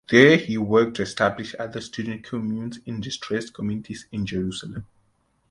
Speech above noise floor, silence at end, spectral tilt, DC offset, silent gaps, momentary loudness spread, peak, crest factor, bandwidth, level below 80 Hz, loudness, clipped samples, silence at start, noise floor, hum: 44 dB; 0.65 s; -5.5 dB/octave; under 0.1%; none; 15 LU; 0 dBFS; 24 dB; 11.5 kHz; -54 dBFS; -24 LUFS; under 0.1%; 0.1 s; -67 dBFS; none